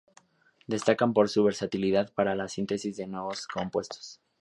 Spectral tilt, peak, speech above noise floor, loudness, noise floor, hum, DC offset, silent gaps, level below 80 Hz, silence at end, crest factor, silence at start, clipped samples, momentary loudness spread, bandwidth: -5.5 dB/octave; -8 dBFS; 34 dB; -28 LUFS; -61 dBFS; none; under 0.1%; none; -64 dBFS; 0.25 s; 22 dB; 0.7 s; under 0.1%; 11 LU; 11.5 kHz